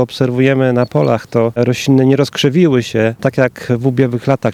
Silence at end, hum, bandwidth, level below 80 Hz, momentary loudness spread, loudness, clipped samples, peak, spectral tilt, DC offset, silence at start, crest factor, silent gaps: 0 s; none; 14.5 kHz; -52 dBFS; 4 LU; -13 LUFS; under 0.1%; 0 dBFS; -6.5 dB/octave; under 0.1%; 0 s; 12 dB; none